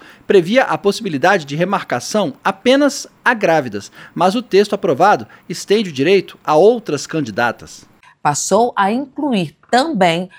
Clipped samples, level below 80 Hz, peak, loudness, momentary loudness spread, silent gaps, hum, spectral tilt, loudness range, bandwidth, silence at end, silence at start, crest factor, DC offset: under 0.1%; -60 dBFS; 0 dBFS; -16 LUFS; 8 LU; none; none; -4.5 dB/octave; 2 LU; 16 kHz; 0.1 s; 0.3 s; 16 dB; under 0.1%